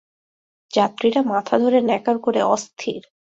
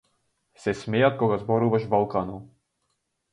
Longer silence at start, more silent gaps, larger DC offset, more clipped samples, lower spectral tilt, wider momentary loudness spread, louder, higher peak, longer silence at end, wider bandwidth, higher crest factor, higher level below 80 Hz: first, 0.75 s vs 0.6 s; neither; neither; neither; second, -4.5 dB/octave vs -7.5 dB/octave; about the same, 9 LU vs 11 LU; first, -20 LUFS vs -24 LUFS; first, -4 dBFS vs -8 dBFS; second, 0.25 s vs 0.85 s; second, 8 kHz vs 10.5 kHz; about the same, 18 dB vs 18 dB; second, -66 dBFS vs -58 dBFS